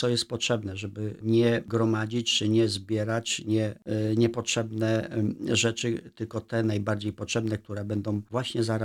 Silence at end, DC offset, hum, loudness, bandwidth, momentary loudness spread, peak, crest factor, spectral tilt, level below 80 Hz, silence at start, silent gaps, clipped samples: 0 s; under 0.1%; none; -28 LUFS; 13 kHz; 8 LU; -12 dBFS; 16 dB; -5 dB/octave; -62 dBFS; 0 s; none; under 0.1%